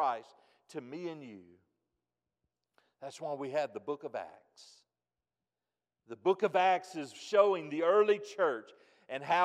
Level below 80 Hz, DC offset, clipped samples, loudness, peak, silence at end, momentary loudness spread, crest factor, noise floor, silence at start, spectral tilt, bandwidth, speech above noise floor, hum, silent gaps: under -90 dBFS; under 0.1%; under 0.1%; -33 LUFS; -14 dBFS; 0 s; 20 LU; 20 dB; under -90 dBFS; 0 s; -4.5 dB/octave; 10.5 kHz; over 57 dB; none; none